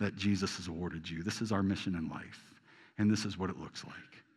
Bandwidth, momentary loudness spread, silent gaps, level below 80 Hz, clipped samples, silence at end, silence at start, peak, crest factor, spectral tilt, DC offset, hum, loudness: 12 kHz; 18 LU; none; -62 dBFS; under 0.1%; 0.15 s; 0 s; -20 dBFS; 16 dB; -5.5 dB/octave; under 0.1%; none; -36 LUFS